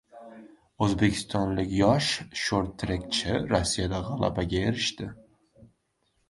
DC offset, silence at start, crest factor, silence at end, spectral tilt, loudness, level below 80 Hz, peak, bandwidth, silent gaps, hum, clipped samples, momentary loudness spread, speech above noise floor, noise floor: under 0.1%; 0.15 s; 22 dB; 0.65 s; -5 dB/octave; -27 LUFS; -44 dBFS; -8 dBFS; 11.5 kHz; none; none; under 0.1%; 10 LU; 46 dB; -73 dBFS